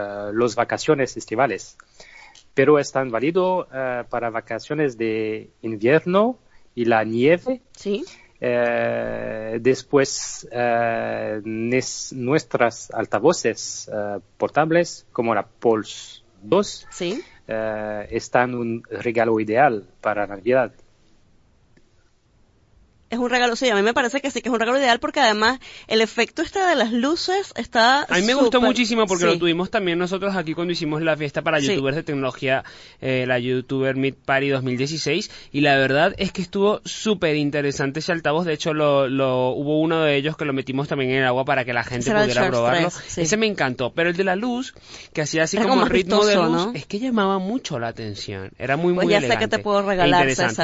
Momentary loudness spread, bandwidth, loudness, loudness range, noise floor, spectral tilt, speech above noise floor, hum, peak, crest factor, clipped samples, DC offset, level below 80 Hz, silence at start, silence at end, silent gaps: 11 LU; 8 kHz; -21 LUFS; 4 LU; -58 dBFS; -4.5 dB/octave; 37 dB; none; -4 dBFS; 18 dB; under 0.1%; under 0.1%; -52 dBFS; 0 s; 0 s; none